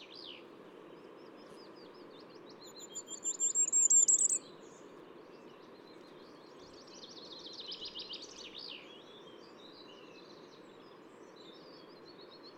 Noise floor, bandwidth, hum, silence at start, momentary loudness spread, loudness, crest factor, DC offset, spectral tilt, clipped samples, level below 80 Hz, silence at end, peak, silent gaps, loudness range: -55 dBFS; over 20 kHz; none; 0 s; 27 LU; -30 LUFS; 22 dB; under 0.1%; 0.5 dB/octave; under 0.1%; -84 dBFS; 0.1 s; -16 dBFS; none; 22 LU